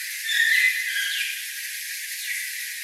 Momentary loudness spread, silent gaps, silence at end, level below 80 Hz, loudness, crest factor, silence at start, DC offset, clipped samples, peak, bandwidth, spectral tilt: 12 LU; none; 0 s; under -90 dBFS; -23 LUFS; 18 dB; 0 s; under 0.1%; under 0.1%; -8 dBFS; 16 kHz; 14 dB/octave